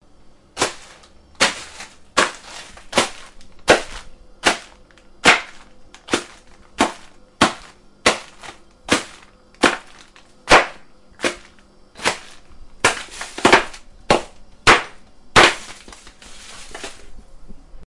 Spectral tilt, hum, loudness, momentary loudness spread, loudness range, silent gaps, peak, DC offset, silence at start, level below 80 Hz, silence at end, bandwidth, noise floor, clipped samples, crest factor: -2 dB/octave; none; -18 LUFS; 24 LU; 6 LU; none; 0 dBFS; under 0.1%; 0.55 s; -44 dBFS; 0.05 s; 11.5 kHz; -48 dBFS; under 0.1%; 22 dB